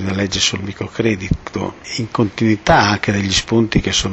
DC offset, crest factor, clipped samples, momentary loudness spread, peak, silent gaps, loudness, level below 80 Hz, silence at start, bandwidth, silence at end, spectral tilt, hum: under 0.1%; 16 dB; under 0.1%; 12 LU; -2 dBFS; none; -17 LUFS; -34 dBFS; 0 s; 8.4 kHz; 0 s; -4 dB/octave; none